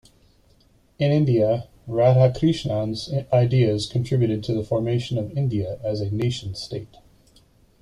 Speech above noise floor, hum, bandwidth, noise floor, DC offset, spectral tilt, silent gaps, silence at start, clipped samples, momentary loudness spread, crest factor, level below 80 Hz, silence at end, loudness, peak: 37 dB; none; 11 kHz; -58 dBFS; under 0.1%; -7.5 dB/octave; none; 1 s; under 0.1%; 9 LU; 18 dB; -50 dBFS; 0.95 s; -22 LUFS; -4 dBFS